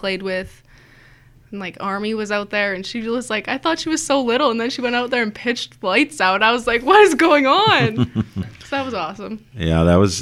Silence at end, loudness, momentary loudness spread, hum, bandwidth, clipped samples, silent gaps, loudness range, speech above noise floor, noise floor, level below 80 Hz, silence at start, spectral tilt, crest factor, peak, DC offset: 0 s; -18 LUFS; 14 LU; none; 15 kHz; under 0.1%; none; 8 LU; 30 dB; -48 dBFS; -42 dBFS; 0 s; -4.5 dB/octave; 18 dB; 0 dBFS; under 0.1%